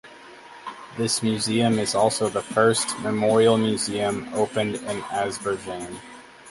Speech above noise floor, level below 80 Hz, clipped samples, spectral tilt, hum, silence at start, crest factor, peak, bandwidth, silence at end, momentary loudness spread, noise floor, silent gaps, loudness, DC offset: 22 dB; -60 dBFS; under 0.1%; -4 dB/octave; none; 0.05 s; 18 dB; -6 dBFS; 11.5 kHz; 0 s; 19 LU; -45 dBFS; none; -23 LUFS; under 0.1%